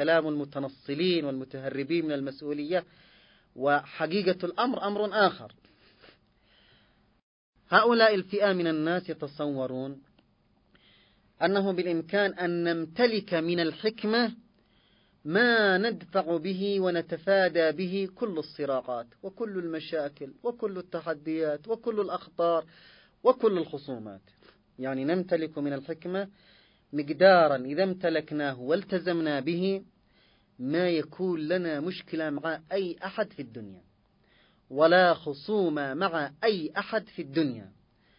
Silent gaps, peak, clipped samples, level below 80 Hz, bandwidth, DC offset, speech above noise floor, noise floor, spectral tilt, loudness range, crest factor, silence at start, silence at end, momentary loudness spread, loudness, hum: 7.23-7.53 s; -6 dBFS; under 0.1%; -72 dBFS; 5.4 kHz; under 0.1%; 39 dB; -67 dBFS; -9.5 dB/octave; 6 LU; 22 dB; 0 s; 0.5 s; 13 LU; -28 LUFS; none